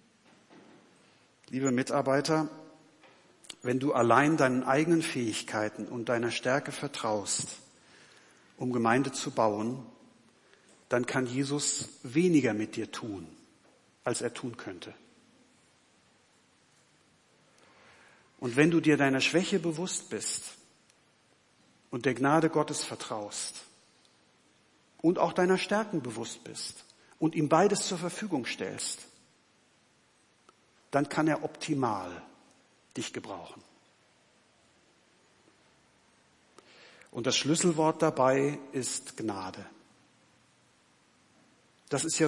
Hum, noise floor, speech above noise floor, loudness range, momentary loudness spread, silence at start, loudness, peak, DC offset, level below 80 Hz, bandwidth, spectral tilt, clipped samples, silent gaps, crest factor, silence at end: none; -67 dBFS; 37 dB; 12 LU; 16 LU; 0.55 s; -30 LUFS; -8 dBFS; under 0.1%; -78 dBFS; 11.5 kHz; -4.5 dB/octave; under 0.1%; none; 24 dB; 0 s